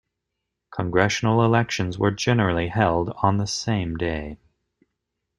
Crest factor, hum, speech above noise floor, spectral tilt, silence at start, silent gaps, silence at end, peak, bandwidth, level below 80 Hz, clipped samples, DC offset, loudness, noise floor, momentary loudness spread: 20 dB; none; 59 dB; -5.5 dB/octave; 0.7 s; none; 1.05 s; -4 dBFS; 11.5 kHz; -48 dBFS; under 0.1%; under 0.1%; -22 LUFS; -81 dBFS; 8 LU